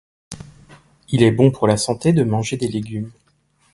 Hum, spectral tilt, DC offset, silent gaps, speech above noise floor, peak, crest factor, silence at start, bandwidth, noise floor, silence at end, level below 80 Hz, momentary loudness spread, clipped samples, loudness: none; -6 dB/octave; under 0.1%; none; 44 dB; 0 dBFS; 20 dB; 0.3 s; 11.5 kHz; -61 dBFS; 0.65 s; -50 dBFS; 22 LU; under 0.1%; -18 LUFS